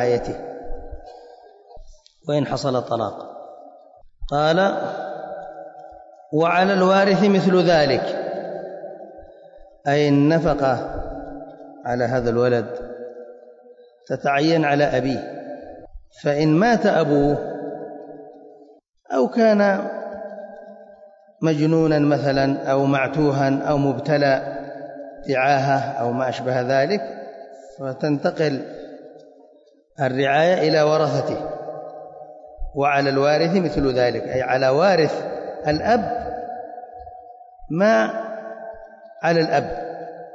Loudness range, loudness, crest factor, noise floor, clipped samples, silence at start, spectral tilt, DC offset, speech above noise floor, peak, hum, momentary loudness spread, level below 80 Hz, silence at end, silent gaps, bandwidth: 6 LU; -20 LUFS; 14 dB; -54 dBFS; under 0.1%; 0 s; -6.5 dB/octave; under 0.1%; 35 dB; -6 dBFS; none; 21 LU; -44 dBFS; 0 s; none; 7.8 kHz